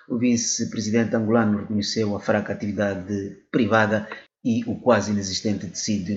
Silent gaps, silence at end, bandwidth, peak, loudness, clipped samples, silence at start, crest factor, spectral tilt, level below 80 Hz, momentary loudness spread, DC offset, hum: none; 0 s; 8 kHz; -2 dBFS; -23 LUFS; under 0.1%; 0.1 s; 20 dB; -5 dB/octave; -62 dBFS; 7 LU; under 0.1%; none